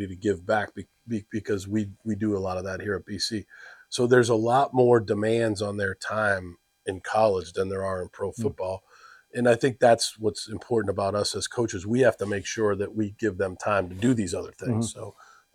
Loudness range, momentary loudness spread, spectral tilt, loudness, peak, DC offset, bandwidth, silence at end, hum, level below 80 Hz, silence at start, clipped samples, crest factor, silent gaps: 5 LU; 13 LU; -5 dB/octave; -26 LUFS; -6 dBFS; under 0.1%; 14.5 kHz; 0.45 s; none; -62 dBFS; 0 s; under 0.1%; 20 dB; none